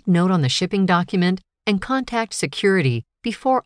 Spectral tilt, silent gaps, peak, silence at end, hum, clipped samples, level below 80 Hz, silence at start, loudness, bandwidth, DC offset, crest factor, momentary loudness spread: -5.5 dB/octave; none; -6 dBFS; 0.05 s; none; under 0.1%; -52 dBFS; 0.05 s; -20 LUFS; 10.5 kHz; under 0.1%; 14 dB; 6 LU